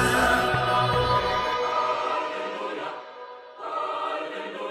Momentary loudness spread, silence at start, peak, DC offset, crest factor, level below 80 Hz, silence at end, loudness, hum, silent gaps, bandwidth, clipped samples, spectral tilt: 16 LU; 0 s; -10 dBFS; under 0.1%; 16 dB; -46 dBFS; 0 s; -25 LUFS; none; none; 16.5 kHz; under 0.1%; -4 dB/octave